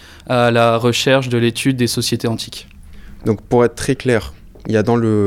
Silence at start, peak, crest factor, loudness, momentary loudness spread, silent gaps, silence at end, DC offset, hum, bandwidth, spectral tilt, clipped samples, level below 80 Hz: 0.1 s; -2 dBFS; 16 dB; -16 LUFS; 11 LU; none; 0 s; under 0.1%; none; 16.5 kHz; -5.5 dB/octave; under 0.1%; -42 dBFS